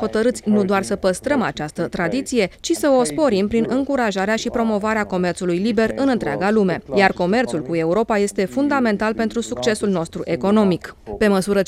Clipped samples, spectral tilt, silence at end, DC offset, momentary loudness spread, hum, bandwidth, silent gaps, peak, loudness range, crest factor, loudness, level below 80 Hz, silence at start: under 0.1%; -5.5 dB/octave; 0 s; under 0.1%; 5 LU; none; 14.5 kHz; none; -2 dBFS; 1 LU; 18 dB; -19 LUFS; -46 dBFS; 0 s